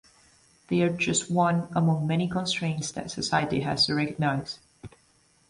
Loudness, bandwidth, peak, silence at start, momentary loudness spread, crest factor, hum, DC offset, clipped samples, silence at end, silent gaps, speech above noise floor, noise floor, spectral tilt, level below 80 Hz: -26 LUFS; 11.5 kHz; -10 dBFS; 0.7 s; 8 LU; 18 dB; none; under 0.1%; under 0.1%; 0.65 s; none; 37 dB; -63 dBFS; -4.5 dB/octave; -58 dBFS